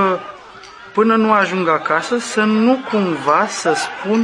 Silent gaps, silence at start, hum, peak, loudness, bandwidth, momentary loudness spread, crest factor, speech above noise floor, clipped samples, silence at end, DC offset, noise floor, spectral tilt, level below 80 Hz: none; 0 s; none; 0 dBFS; -16 LUFS; 11.5 kHz; 10 LU; 16 dB; 22 dB; under 0.1%; 0 s; under 0.1%; -38 dBFS; -4.5 dB/octave; -62 dBFS